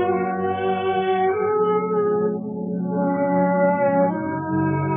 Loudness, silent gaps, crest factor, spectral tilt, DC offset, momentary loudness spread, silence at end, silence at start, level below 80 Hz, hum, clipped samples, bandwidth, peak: -21 LUFS; none; 14 dB; -6.5 dB/octave; under 0.1%; 6 LU; 0 s; 0 s; -70 dBFS; none; under 0.1%; 3.6 kHz; -8 dBFS